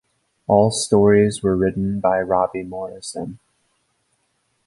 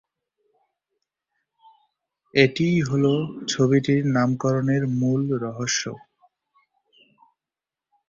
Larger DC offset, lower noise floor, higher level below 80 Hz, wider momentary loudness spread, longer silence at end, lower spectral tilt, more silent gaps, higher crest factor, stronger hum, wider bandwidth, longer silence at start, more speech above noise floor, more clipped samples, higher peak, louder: neither; second, -68 dBFS vs -89 dBFS; first, -48 dBFS vs -60 dBFS; first, 15 LU vs 7 LU; second, 1.3 s vs 2.1 s; about the same, -5.5 dB/octave vs -5.5 dB/octave; neither; about the same, 18 dB vs 22 dB; neither; first, 11.5 kHz vs 7.8 kHz; second, 0.5 s vs 2.35 s; second, 50 dB vs 68 dB; neither; about the same, -2 dBFS vs -2 dBFS; first, -19 LUFS vs -22 LUFS